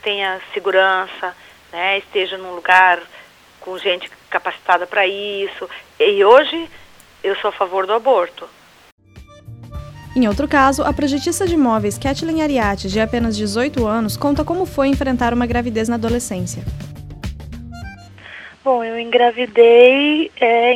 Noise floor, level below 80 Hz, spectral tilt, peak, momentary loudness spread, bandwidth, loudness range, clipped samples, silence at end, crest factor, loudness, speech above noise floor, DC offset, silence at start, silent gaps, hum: -42 dBFS; -38 dBFS; -4.5 dB/octave; 0 dBFS; 20 LU; 15 kHz; 5 LU; under 0.1%; 0 s; 18 dB; -16 LUFS; 26 dB; under 0.1%; 0.05 s; 8.92-8.98 s; none